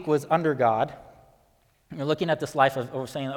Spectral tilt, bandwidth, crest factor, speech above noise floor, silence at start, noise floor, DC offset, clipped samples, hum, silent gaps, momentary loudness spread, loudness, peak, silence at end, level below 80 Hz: -6 dB/octave; 18.5 kHz; 20 dB; 39 dB; 0 s; -64 dBFS; under 0.1%; under 0.1%; none; none; 10 LU; -25 LUFS; -6 dBFS; 0 s; -64 dBFS